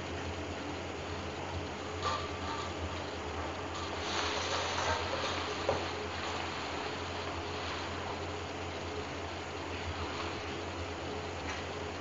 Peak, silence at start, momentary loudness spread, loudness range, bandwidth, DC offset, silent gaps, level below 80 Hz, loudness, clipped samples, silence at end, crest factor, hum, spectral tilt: -18 dBFS; 0 s; 6 LU; 4 LU; 8.2 kHz; under 0.1%; none; -56 dBFS; -37 LUFS; under 0.1%; 0 s; 20 dB; none; -4 dB/octave